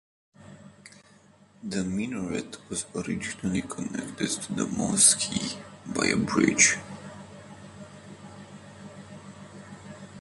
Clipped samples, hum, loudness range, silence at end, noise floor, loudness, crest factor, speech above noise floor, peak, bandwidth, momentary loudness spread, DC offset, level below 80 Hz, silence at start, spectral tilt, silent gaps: under 0.1%; none; 11 LU; 0 s; -57 dBFS; -25 LUFS; 26 dB; 30 dB; -4 dBFS; 11.5 kHz; 26 LU; under 0.1%; -58 dBFS; 0.4 s; -2.5 dB/octave; none